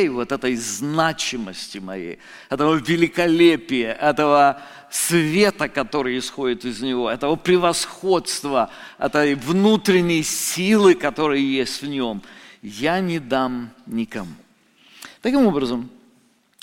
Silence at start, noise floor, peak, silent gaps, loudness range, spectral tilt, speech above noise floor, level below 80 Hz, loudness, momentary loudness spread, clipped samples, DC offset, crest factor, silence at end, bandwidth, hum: 0 s; -59 dBFS; -2 dBFS; none; 6 LU; -4.5 dB/octave; 39 dB; -52 dBFS; -20 LUFS; 15 LU; under 0.1%; under 0.1%; 18 dB; 0.75 s; 17 kHz; none